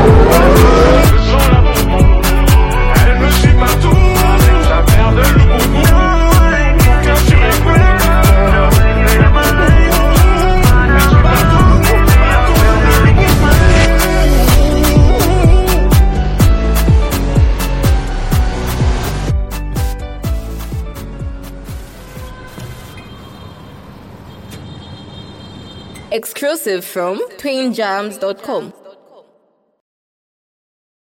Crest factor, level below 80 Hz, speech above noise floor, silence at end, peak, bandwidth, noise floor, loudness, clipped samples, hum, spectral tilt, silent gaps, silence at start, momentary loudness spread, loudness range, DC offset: 10 dB; -12 dBFS; 39 dB; 2.5 s; 0 dBFS; 17 kHz; -57 dBFS; -11 LUFS; 0.5%; none; -5.5 dB/octave; none; 0 s; 19 LU; 18 LU; under 0.1%